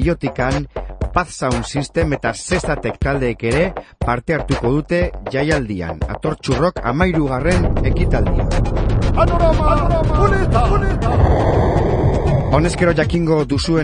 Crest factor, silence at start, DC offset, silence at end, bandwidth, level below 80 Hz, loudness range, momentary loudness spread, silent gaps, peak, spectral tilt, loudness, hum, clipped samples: 16 dB; 0 s; under 0.1%; 0 s; 10.5 kHz; -22 dBFS; 4 LU; 6 LU; none; 0 dBFS; -6.5 dB/octave; -17 LUFS; none; under 0.1%